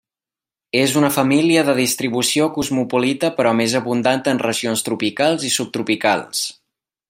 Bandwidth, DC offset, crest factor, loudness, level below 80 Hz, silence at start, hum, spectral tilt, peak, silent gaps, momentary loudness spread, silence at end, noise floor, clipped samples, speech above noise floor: 16 kHz; under 0.1%; 18 dB; -18 LUFS; -60 dBFS; 0.75 s; none; -3.5 dB/octave; -2 dBFS; none; 6 LU; 0.6 s; under -90 dBFS; under 0.1%; over 72 dB